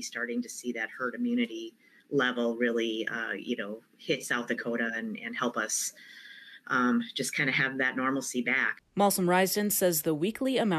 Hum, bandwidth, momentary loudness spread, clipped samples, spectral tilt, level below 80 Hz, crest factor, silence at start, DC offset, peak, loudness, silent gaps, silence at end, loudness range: none; 14 kHz; 10 LU; under 0.1%; -3.5 dB/octave; -76 dBFS; 18 dB; 0 s; under 0.1%; -14 dBFS; -29 LUFS; none; 0 s; 5 LU